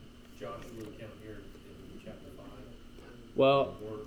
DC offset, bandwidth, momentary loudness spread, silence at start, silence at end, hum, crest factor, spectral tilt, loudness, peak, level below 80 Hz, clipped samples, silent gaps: under 0.1%; 15 kHz; 26 LU; 0 s; 0 s; none; 20 dB; -6.5 dB/octave; -31 LUFS; -16 dBFS; -56 dBFS; under 0.1%; none